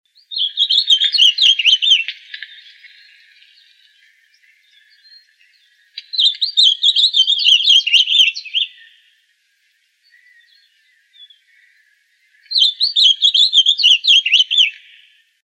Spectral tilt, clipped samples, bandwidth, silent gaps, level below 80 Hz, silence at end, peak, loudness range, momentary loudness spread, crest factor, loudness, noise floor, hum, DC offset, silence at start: 10.5 dB/octave; under 0.1%; 20 kHz; none; under -90 dBFS; 0.8 s; -2 dBFS; 11 LU; 11 LU; 14 dB; -11 LUFS; -62 dBFS; none; under 0.1%; 0.3 s